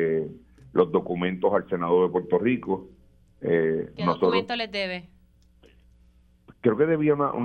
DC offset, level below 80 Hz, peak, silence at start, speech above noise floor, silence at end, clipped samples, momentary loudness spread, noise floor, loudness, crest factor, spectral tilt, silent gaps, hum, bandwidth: under 0.1%; -58 dBFS; -8 dBFS; 0 s; 34 dB; 0 s; under 0.1%; 9 LU; -58 dBFS; -25 LUFS; 18 dB; -8 dB/octave; none; none; 6.4 kHz